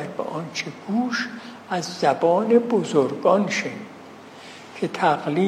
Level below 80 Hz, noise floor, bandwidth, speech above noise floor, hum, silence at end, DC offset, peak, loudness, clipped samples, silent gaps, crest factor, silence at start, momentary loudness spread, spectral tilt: -74 dBFS; -42 dBFS; 13 kHz; 20 dB; none; 0 s; under 0.1%; -4 dBFS; -22 LUFS; under 0.1%; none; 18 dB; 0 s; 21 LU; -5.5 dB/octave